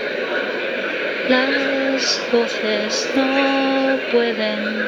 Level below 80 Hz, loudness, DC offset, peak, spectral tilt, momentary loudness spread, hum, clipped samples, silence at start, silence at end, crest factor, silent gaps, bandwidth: -64 dBFS; -19 LUFS; under 0.1%; -2 dBFS; -3 dB/octave; 5 LU; none; under 0.1%; 0 s; 0 s; 16 dB; none; 19.5 kHz